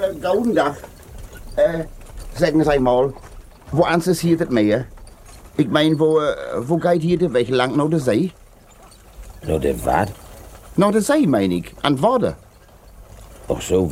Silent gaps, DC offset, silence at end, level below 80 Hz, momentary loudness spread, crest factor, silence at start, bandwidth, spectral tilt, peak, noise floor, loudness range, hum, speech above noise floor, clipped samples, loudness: none; under 0.1%; 0 s; -40 dBFS; 16 LU; 18 dB; 0 s; 16.5 kHz; -6 dB/octave; -2 dBFS; -46 dBFS; 3 LU; none; 28 dB; under 0.1%; -19 LUFS